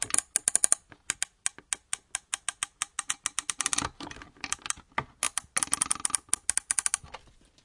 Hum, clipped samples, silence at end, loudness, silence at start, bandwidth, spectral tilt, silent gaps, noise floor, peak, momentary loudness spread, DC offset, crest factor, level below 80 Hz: none; under 0.1%; 0.5 s; -29 LUFS; 0 s; 11.5 kHz; 0.5 dB/octave; none; -51 dBFS; -2 dBFS; 10 LU; under 0.1%; 32 dB; -60 dBFS